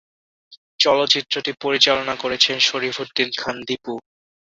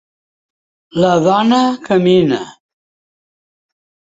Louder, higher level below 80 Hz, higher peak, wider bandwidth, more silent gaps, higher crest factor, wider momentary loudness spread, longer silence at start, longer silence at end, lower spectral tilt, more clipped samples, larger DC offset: second, -19 LUFS vs -13 LUFS; second, -62 dBFS vs -54 dBFS; about the same, 0 dBFS vs -2 dBFS; about the same, 8 kHz vs 8 kHz; first, 0.57-0.79 s vs none; first, 22 dB vs 14 dB; about the same, 12 LU vs 11 LU; second, 0.5 s vs 0.95 s; second, 0.4 s vs 1.65 s; second, -2 dB/octave vs -6.5 dB/octave; neither; neither